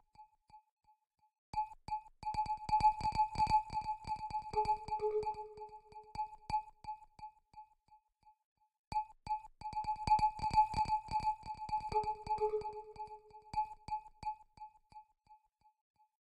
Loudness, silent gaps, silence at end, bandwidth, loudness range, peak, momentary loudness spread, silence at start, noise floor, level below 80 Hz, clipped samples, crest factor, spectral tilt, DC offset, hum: -38 LUFS; 0.71-0.77 s, 1.38-1.53 s, 8.45-8.56 s, 8.79-8.91 s; 0.9 s; 10.5 kHz; 11 LU; -20 dBFS; 18 LU; 0.2 s; -74 dBFS; -56 dBFS; under 0.1%; 20 dB; -5 dB/octave; under 0.1%; none